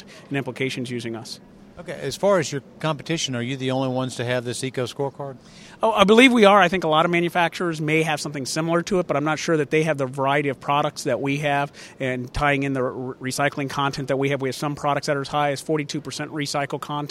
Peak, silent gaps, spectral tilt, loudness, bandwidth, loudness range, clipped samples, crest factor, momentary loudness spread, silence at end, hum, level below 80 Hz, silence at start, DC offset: 0 dBFS; none; -5 dB/octave; -22 LUFS; 15.5 kHz; 8 LU; under 0.1%; 22 dB; 11 LU; 0 s; none; -52 dBFS; 0 s; under 0.1%